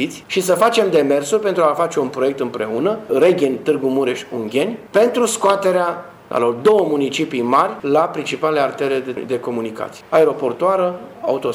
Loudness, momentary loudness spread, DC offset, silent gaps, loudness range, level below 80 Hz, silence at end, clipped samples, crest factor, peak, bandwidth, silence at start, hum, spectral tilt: -18 LUFS; 8 LU; under 0.1%; none; 2 LU; -64 dBFS; 0 s; under 0.1%; 16 dB; 0 dBFS; 18 kHz; 0 s; none; -4.5 dB/octave